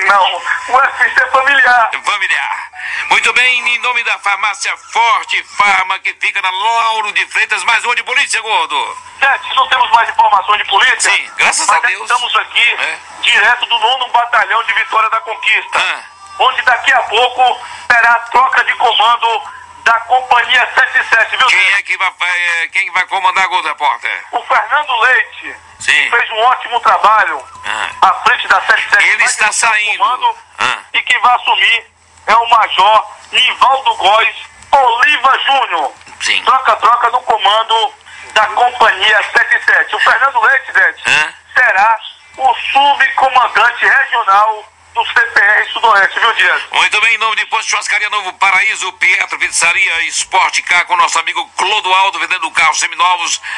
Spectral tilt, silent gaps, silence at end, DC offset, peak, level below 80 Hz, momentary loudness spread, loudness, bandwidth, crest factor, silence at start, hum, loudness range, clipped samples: 1 dB/octave; none; 0 s; under 0.1%; 0 dBFS; -56 dBFS; 7 LU; -10 LUFS; 11.5 kHz; 12 dB; 0 s; none; 2 LU; under 0.1%